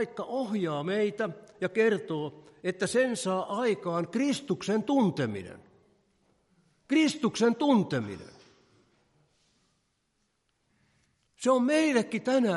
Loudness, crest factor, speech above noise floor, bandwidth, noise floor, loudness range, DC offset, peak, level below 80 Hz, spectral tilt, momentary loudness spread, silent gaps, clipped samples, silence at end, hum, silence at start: -28 LUFS; 18 dB; 48 dB; 11.5 kHz; -76 dBFS; 4 LU; under 0.1%; -12 dBFS; -76 dBFS; -5.5 dB/octave; 10 LU; none; under 0.1%; 0 s; none; 0 s